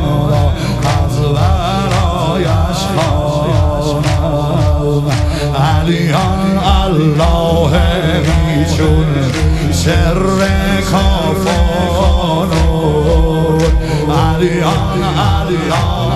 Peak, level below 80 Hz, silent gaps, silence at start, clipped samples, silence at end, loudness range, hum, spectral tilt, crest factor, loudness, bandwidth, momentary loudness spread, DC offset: 0 dBFS; -18 dBFS; none; 0 s; under 0.1%; 0 s; 2 LU; none; -6 dB/octave; 12 dB; -13 LUFS; 13.5 kHz; 2 LU; under 0.1%